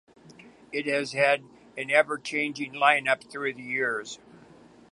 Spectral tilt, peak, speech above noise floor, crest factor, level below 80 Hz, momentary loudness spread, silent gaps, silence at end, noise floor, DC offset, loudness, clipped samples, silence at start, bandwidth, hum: -3.5 dB/octave; -4 dBFS; 26 dB; 24 dB; -76 dBFS; 13 LU; none; 0.4 s; -53 dBFS; under 0.1%; -26 LUFS; under 0.1%; 0.45 s; 11.5 kHz; none